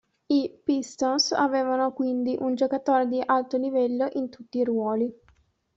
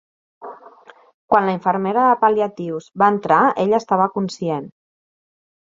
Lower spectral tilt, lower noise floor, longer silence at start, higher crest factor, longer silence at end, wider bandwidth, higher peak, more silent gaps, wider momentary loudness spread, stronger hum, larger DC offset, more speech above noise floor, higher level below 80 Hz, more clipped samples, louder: second, -3.5 dB/octave vs -6.5 dB/octave; first, -63 dBFS vs -46 dBFS; about the same, 0.3 s vs 0.4 s; about the same, 16 dB vs 18 dB; second, 0.65 s vs 0.9 s; about the same, 7.8 kHz vs 7.8 kHz; second, -10 dBFS vs -2 dBFS; second, none vs 1.14-1.28 s; second, 6 LU vs 13 LU; neither; neither; first, 39 dB vs 29 dB; second, -70 dBFS vs -64 dBFS; neither; second, -25 LUFS vs -18 LUFS